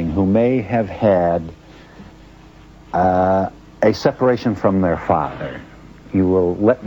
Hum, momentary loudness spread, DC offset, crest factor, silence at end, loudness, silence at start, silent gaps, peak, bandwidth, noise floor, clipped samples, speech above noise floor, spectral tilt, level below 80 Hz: none; 10 LU; under 0.1%; 18 dB; 0 s; -18 LUFS; 0 s; none; 0 dBFS; 18 kHz; -42 dBFS; under 0.1%; 26 dB; -8.5 dB/octave; -44 dBFS